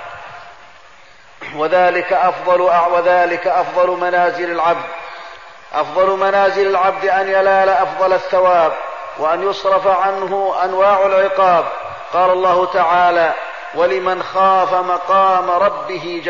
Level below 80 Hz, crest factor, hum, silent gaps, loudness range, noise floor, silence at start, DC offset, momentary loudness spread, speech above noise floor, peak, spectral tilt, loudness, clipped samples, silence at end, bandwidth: -56 dBFS; 12 dB; none; none; 2 LU; -44 dBFS; 0 s; 0.5%; 12 LU; 30 dB; -4 dBFS; -5 dB/octave; -15 LUFS; under 0.1%; 0 s; 7.4 kHz